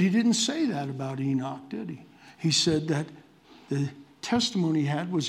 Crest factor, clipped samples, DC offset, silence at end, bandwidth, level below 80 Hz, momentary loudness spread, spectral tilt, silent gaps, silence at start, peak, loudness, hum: 16 dB; under 0.1%; under 0.1%; 0 s; 13.5 kHz; -66 dBFS; 14 LU; -4.5 dB/octave; none; 0 s; -12 dBFS; -27 LUFS; none